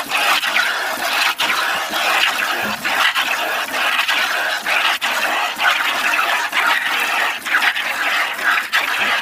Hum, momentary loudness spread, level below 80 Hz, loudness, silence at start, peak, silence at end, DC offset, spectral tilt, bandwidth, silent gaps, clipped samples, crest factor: none; 3 LU; -64 dBFS; -16 LUFS; 0 s; -2 dBFS; 0 s; under 0.1%; 0.5 dB/octave; 16 kHz; none; under 0.1%; 16 dB